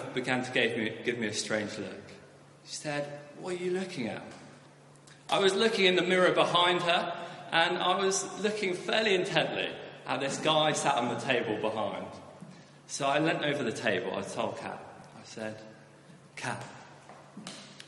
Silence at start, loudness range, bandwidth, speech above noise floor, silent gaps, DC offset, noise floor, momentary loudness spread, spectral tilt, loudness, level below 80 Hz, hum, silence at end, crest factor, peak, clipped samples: 0 s; 11 LU; 11.5 kHz; 25 dB; none; under 0.1%; -55 dBFS; 22 LU; -3.5 dB/octave; -29 LUFS; -74 dBFS; none; 0 s; 24 dB; -8 dBFS; under 0.1%